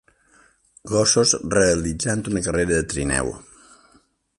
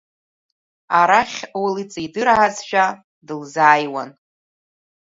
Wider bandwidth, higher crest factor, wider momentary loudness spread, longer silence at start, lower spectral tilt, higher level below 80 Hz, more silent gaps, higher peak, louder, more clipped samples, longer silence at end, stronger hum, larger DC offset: first, 11.5 kHz vs 7.8 kHz; about the same, 20 dB vs 20 dB; second, 8 LU vs 16 LU; about the same, 0.85 s vs 0.9 s; about the same, -3.5 dB/octave vs -3.5 dB/octave; first, -40 dBFS vs -60 dBFS; second, none vs 3.04-3.22 s; second, -4 dBFS vs 0 dBFS; about the same, -20 LUFS vs -18 LUFS; neither; about the same, 1 s vs 0.95 s; neither; neither